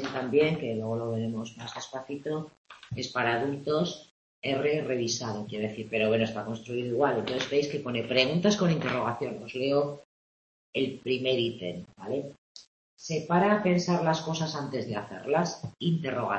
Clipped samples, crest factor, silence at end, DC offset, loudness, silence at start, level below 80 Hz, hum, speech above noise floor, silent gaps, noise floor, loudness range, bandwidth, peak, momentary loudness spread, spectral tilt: under 0.1%; 20 dB; 0 s; under 0.1%; -29 LUFS; 0 s; -66 dBFS; none; over 61 dB; 2.57-2.65 s, 4.11-4.42 s, 10.05-10.73 s, 12.38-12.55 s, 12.67-12.97 s; under -90 dBFS; 5 LU; 8.4 kHz; -8 dBFS; 12 LU; -5.5 dB/octave